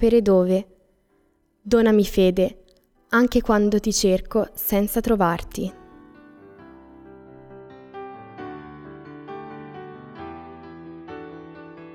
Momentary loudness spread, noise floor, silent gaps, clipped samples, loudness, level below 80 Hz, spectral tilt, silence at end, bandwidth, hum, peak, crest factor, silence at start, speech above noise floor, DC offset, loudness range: 23 LU; -64 dBFS; none; under 0.1%; -20 LUFS; -42 dBFS; -5.5 dB/octave; 0 s; over 20 kHz; none; -6 dBFS; 18 dB; 0 s; 45 dB; under 0.1%; 19 LU